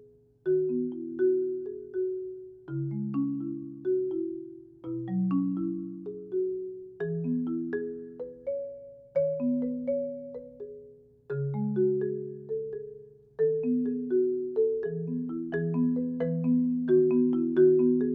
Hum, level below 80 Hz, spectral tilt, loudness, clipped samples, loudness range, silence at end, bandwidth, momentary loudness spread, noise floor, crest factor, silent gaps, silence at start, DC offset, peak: none; -70 dBFS; -11 dB/octave; -29 LUFS; under 0.1%; 6 LU; 0 s; 3.6 kHz; 16 LU; -53 dBFS; 16 dB; none; 0 s; under 0.1%; -12 dBFS